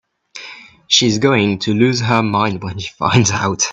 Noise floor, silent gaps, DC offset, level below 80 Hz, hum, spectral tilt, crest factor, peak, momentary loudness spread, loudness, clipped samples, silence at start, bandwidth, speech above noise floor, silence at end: -37 dBFS; none; under 0.1%; -52 dBFS; none; -4 dB/octave; 16 dB; 0 dBFS; 18 LU; -15 LUFS; under 0.1%; 0.35 s; 8.4 kHz; 22 dB; 0 s